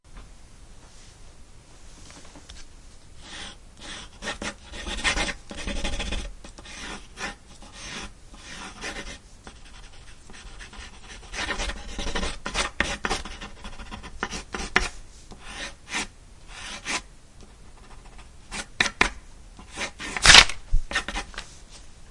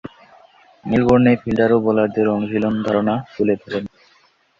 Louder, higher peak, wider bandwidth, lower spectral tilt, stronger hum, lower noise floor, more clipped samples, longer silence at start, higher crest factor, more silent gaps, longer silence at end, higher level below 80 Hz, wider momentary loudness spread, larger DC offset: second, -24 LUFS vs -18 LUFS; about the same, 0 dBFS vs -2 dBFS; first, 12 kHz vs 7.2 kHz; second, -1 dB/octave vs -8.5 dB/octave; neither; about the same, -47 dBFS vs -50 dBFS; neither; about the same, 0.1 s vs 0.05 s; first, 28 dB vs 16 dB; neither; second, 0 s vs 0.7 s; first, -38 dBFS vs -48 dBFS; first, 21 LU vs 13 LU; neither